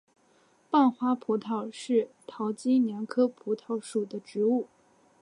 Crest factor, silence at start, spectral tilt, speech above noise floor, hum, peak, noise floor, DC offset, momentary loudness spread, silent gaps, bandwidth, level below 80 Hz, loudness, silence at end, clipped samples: 18 dB; 0.7 s; -6 dB/octave; 37 dB; none; -12 dBFS; -64 dBFS; under 0.1%; 10 LU; none; 11 kHz; -82 dBFS; -29 LUFS; 0.55 s; under 0.1%